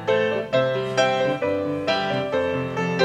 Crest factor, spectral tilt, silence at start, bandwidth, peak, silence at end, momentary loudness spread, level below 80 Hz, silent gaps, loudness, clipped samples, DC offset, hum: 16 dB; -5 dB/octave; 0 s; 10 kHz; -6 dBFS; 0 s; 4 LU; -58 dBFS; none; -23 LUFS; under 0.1%; under 0.1%; none